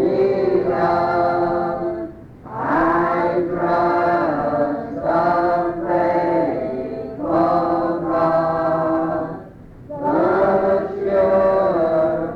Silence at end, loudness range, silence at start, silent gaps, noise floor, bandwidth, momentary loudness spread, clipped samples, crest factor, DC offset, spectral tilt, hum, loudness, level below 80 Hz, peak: 0 s; 1 LU; 0 s; none; -39 dBFS; 6 kHz; 9 LU; under 0.1%; 14 dB; under 0.1%; -9 dB/octave; none; -19 LUFS; -48 dBFS; -4 dBFS